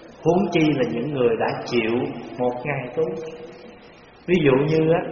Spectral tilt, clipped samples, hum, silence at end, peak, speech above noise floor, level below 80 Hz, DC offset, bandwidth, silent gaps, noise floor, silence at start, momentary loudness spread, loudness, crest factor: -5.5 dB/octave; under 0.1%; none; 0 s; -6 dBFS; 26 dB; -52 dBFS; under 0.1%; 6.8 kHz; none; -47 dBFS; 0 s; 14 LU; -22 LUFS; 16 dB